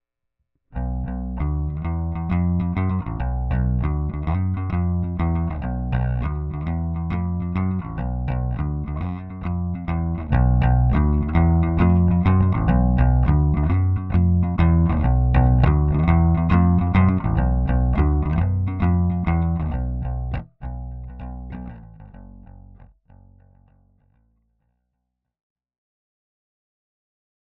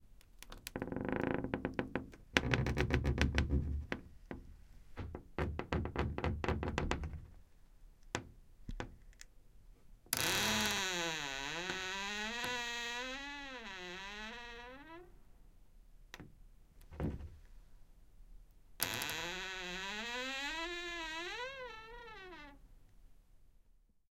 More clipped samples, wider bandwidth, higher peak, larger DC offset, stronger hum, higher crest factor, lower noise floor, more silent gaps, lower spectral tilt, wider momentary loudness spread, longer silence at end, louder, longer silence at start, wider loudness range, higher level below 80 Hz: neither; second, 4.1 kHz vs 16.5 kHz; about the same, -4 dBFS vs -4 dBFS; neither; neither; second, 16 dB vs 36 dB; first, -78 dBFS vs -68 dBFS; neither; first, -11.5 dB/octave vs -3.5 dB/octave; second, 11 LU vs 21 LU; first, 4.65 s vs 0.4 s; first, -21 LUFS vs -39 LUFS; first, 0.75 s vs 0 s; second, 9 LU vs 13 LU; first, -26 dBFS vs -48 dBFS